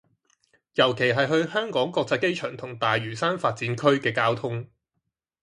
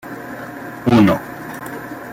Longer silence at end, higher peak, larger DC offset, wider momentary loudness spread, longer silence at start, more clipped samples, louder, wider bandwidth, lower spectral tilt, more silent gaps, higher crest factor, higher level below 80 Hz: first, 0.75 s vs 0 s; about the same, -4 dBFS vs -2 dBFS; neither; second, 9 LU vs 17 LU; first, 0.75 s vs 0.05 s; neither; second, -24 LUFS vs -16 LUFS; second, 11.5 kHz vs 16.5 kHz; second, -5.5 dB/octave vs -7 dB/octave; neither; about the same, 20 dB vs 16 dB; second, -66 dBFS vs -48 dBFS